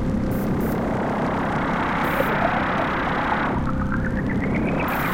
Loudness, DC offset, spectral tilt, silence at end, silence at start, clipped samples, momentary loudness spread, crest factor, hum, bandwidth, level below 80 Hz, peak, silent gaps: -23 LUFS; under 0.1%; -7 dB/octave; 0 s; 0 s; under 0.1%; 3 LU; 16 dB; none; 17 kHz; -34 dBFS; -6 dBFS; none